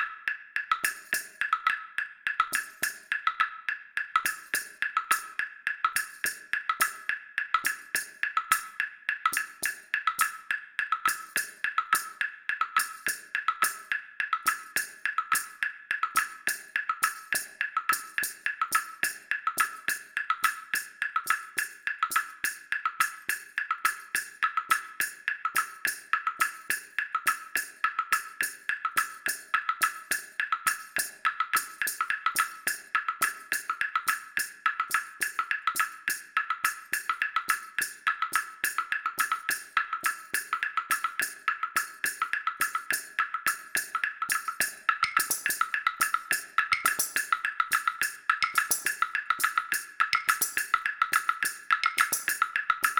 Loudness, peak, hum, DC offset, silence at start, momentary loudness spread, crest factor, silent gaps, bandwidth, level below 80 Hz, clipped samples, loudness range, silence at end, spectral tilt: -29 LUFS; -6 dBFS; none; under 0.1%; 0 s; 6 LU; 24 dB; none; 19.5 kHz; -72 dBFS; under 0.1%; 3 LU; 0 s; 1.5 dB/octave